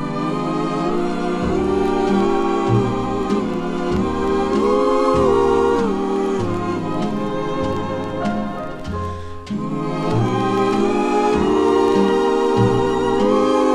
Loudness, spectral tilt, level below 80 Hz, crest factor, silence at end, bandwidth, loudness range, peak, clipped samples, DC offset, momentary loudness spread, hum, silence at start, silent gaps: -19 LUFS; -7 dB/octave; -38 dBFS; 14 dB; 0 s; 11.5 kHz; 6 LU; -4 dBFS; under 0.1%; under 0.1%; 8 LU; none; 0 s; none